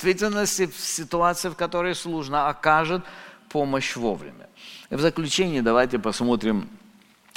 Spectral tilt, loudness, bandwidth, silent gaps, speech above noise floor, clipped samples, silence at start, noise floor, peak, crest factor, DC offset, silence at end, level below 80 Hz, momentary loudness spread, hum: -4 dB/octave; -24 LUFS; 17 kHz; none; 30 dB; under 0.1%; 0 s; -54 dBFS; -2 dBFS; 22 dB; under 0.1%; 0.6 s; -50 dBFS; 17 LU; none